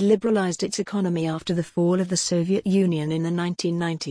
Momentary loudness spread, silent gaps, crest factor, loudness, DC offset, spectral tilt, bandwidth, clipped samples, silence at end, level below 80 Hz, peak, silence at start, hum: 5 LU; none; 16 dB; -23 LUFS; under 0.1%; -5.5 dB/octave; 10.5 kHz; under 0.1%; 0 s; -60 dBFS; -8 dBFS; 0 s; none